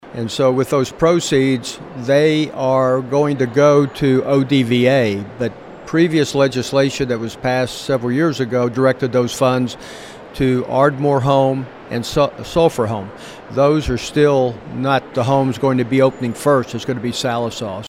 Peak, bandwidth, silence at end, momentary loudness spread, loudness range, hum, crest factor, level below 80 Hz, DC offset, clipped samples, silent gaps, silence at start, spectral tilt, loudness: 0 dBFS; 16 kHz; 0 s; 10 LU; 3 LU; none; 16 dB; -44 dBFS; under 0.1%; under 0.1%; none; 0.05 s; -6 dB/octave; -17 LUFS